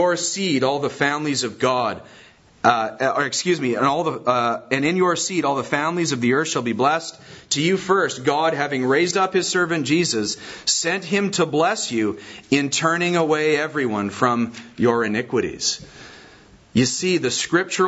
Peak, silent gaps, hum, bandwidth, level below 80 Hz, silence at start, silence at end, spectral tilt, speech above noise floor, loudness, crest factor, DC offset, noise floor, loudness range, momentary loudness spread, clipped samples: 0 dBFS; none; none; 8 kHz; -58 dBFS; 0 s; 0 s; -3.5 dB/octave; 28 dB; -20 LUFS; 20 dB; under 0.1%; -48 dBFS; 2 LU; 5 LU; under 0.1%